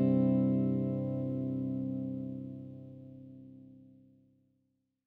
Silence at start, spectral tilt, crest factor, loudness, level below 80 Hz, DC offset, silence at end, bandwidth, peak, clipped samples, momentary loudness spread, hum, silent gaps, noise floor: 0 s; -12.5 dB/octave; 16 dB; -33 LUFS; -70 dBFS; under 0.1%; 1.2 s; 3.8 kHz; -20 dBFS; under 0.1%; 23 LU; 50 Hz at -70 dBFS; none; -79 dBFS